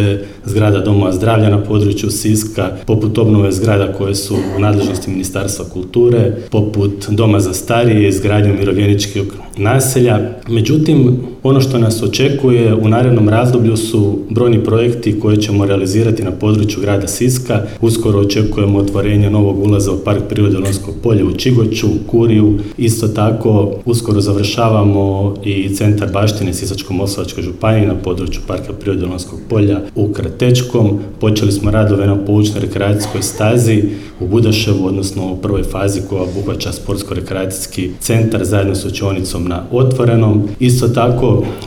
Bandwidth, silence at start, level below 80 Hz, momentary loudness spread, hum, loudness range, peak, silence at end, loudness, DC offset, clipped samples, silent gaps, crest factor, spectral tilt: 16.5 kHz; 0 s; -32 dBFS; 8 LU; none; 5 LU; 0 dBFS; 0 s; -13 LUFS; under 0.1%; under 0.1%; none; 12 dB; -6.5 dB/octave